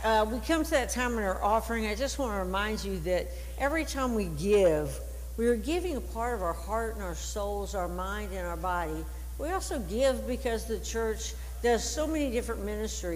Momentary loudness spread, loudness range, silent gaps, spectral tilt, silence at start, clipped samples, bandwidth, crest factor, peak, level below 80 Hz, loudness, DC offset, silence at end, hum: 8 LU; 4 LU; none; -4.5 dB/octave; 0 s; under 0.1%; 16 kHz; 16 dB; -14 dBFS; -38 dBFS; -31 LUFS; under 0.1%; 0 s; none